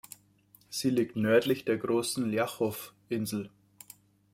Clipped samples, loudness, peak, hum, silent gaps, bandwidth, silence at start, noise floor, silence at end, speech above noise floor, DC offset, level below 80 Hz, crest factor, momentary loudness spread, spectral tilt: under 0.1%; -30 LUFS; -12 dBFS; none; none; 16.5 kHz; 0.7 s; -63 dBFS; 0.85 s; 33 dB; under 0.1%; -72 dBFS; 20 dB; 24 LU; -5 dB/octave